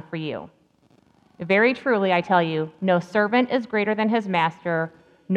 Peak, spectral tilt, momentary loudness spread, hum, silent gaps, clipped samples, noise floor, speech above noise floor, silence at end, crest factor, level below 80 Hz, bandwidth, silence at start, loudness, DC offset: -6 dBFS; -7.5 dB/octave; 11 LU; none; none; under 0.1%; -59 dBFS; 37 dB; 0 s; 18 dB; -70 dBFS; 8.8 kHz; 0.1 s; -22 LUFS; under 0.1%